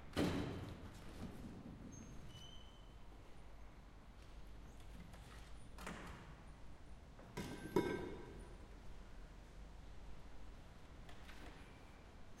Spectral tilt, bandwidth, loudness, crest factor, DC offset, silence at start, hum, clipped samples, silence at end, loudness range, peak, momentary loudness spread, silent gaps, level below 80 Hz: -6 dB/octave; 16 kHz; -52 LUFS; 26 dB; under 0.1%; 0 s; none; under 0.1%; 0 s; 11 LU; -24 dBFS; 19 LU; none; -58 dBFS